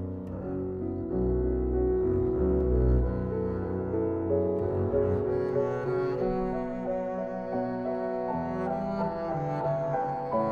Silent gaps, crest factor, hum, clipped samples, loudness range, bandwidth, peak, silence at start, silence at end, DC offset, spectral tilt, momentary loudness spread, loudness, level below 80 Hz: none; 14 dB; none; under 0.1%; 3 LU; 4.9 kHz; -14 dBFS; 0 s; 0 s; under 0.1%; -10.5 dB/octave; 6 LU; -29 LUFS; -36 dBFS